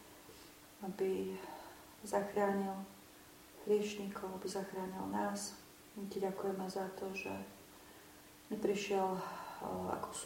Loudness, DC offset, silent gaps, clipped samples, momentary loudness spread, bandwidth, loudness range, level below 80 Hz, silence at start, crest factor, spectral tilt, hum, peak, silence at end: -40 LUFS; under 0.1%; none; under 0.1%; 21 LU; 16.5 kHz; 3 LU; -72 dBFS; 0 s; 20 dB; -5 dB/octave; none; -22 dBFS; 0 s